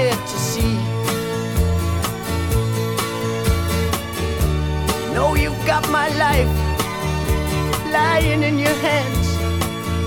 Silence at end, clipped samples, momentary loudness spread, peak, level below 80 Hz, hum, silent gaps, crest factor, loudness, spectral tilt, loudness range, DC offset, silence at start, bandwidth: 0 s; under 0.1%; 6 LU; -2 dBFS; -26 dBFS; none; none; 16 dB; -20 LUFS; -5 dB/octave; 3 LU; under 0.1%; 0 s; 19 kHz